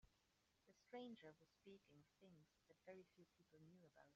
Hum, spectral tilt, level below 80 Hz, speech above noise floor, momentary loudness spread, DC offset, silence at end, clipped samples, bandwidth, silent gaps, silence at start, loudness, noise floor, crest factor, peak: none; -4.5 dB/octave; -90 dBFS; 18 dB; 10 LU; under 0.1%; 0 s; under 0.1%; 7.2 kHz; none; 0.05 s; -63 LUFS; -85 dBFS; 20 dB; -46 dBFS